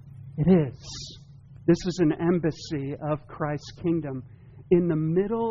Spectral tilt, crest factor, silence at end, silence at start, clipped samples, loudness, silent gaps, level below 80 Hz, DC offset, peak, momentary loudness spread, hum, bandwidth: -7.5 dB/octave; 18 dB; 0 s; 0.05 s; under 0.1%; -26 LUFS; none; -52 dBFS; under 0.1%; -8 dBFS; 16 LU; none; 7.4 kHz